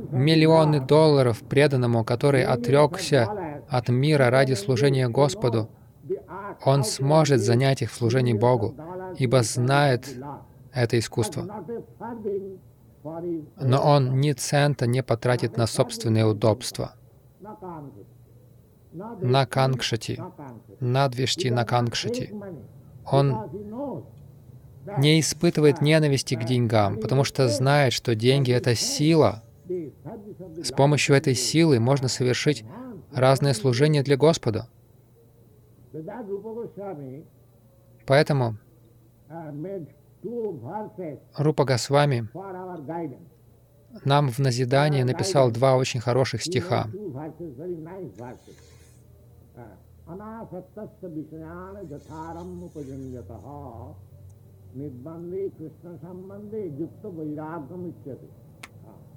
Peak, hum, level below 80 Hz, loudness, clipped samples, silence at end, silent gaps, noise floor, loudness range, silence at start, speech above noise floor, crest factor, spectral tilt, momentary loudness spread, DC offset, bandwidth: -4 dBFS; none; -58 dBFS; -23 LUFS; under 0.1%; 0.25 s; none; -55 dBFS; 17 LU; 0 s; 32 dB; 20 dB; -5.5 dB/octave; 20 LU; under 0.1%; 15.5 kHz